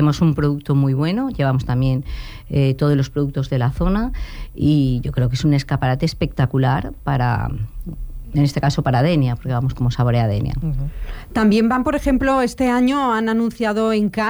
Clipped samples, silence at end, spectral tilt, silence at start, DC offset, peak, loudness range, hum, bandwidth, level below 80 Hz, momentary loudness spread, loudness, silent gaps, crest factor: under 0.1%; 0 s; -7.5 dB/octave; 0 s; under 0.1%; -6 dBFS; 2 LU; none; over 20 kHz; -32 dBFS; 9 LU; -19 LUFS; none; 12 dB